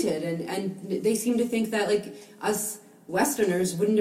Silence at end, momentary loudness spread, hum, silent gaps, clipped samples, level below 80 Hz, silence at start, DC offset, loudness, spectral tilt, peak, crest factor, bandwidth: 0 s; 8 LU; none; none; under 0.1%; -66 dBFS; 0 s; under 0.1%; -27 LUFS; -4.5 dB/octave; -12 dBFS; 16 dB; 16 kHz